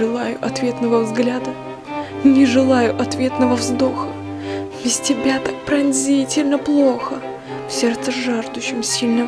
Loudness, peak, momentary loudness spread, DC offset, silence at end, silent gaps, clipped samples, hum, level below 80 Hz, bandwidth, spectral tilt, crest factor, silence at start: -18 LUFS; -2 dBFS; 12 LU; under 0.1%; 0 s; none; under 0.1%; none; -54 dBFS; 13.5 kHz; -4 dB/octave; 16 dB; 0 s